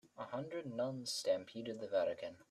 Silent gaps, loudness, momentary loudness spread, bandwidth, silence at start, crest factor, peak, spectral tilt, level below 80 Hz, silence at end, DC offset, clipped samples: none; -41 LUFS; 9 LU; 14 kHz; 0.05 s; 18 dB; -24 dBFS; -4 dB/octave; -84 dBFS; 0.1 s; under 0.1%; under 0.1%